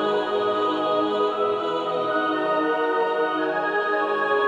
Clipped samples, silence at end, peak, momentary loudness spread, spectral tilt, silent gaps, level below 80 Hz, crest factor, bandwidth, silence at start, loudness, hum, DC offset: under 0.1%; 0 s; -10 dBFS; 2 LU; -5.5 dB/octave; none; -72 dBFS; 14 dB; 9.2 kHz; 0 s; -23 LUFS; none; under 0.1%